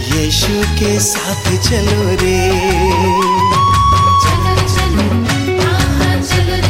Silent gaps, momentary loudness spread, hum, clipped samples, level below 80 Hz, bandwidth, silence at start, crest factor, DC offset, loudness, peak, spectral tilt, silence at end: none; 4 LU; none; under 0.1%; -22 dBFS; 16.5 kHz; 0 s; 12 dB; under 0.1%; -12 LUFS; 0 dBFS; -4.5 dB/octave; 0 s